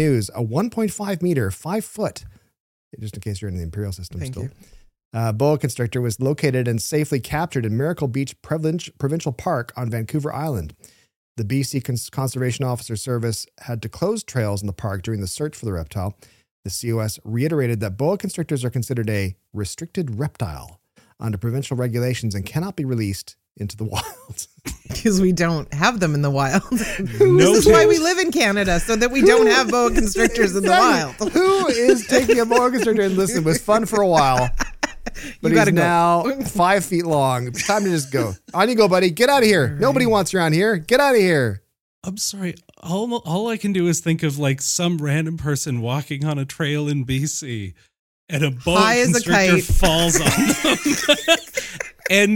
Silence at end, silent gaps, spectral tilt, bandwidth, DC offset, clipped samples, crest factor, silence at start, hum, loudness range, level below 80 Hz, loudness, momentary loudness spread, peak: 0 s; 2.60-2.91 s, 5.05-5.11 s, 11.16-11.35 s, 16.51-16.63 s, 41.81-42.02 s, 47.99-48.27 s; -5 dB/octave; 17 kHz; under 0.1%; under 0.1%; 18 dB; 0 s; none; 10 LU; -36 dBFS; -19 LUFS; 14 LU; 0 dBFS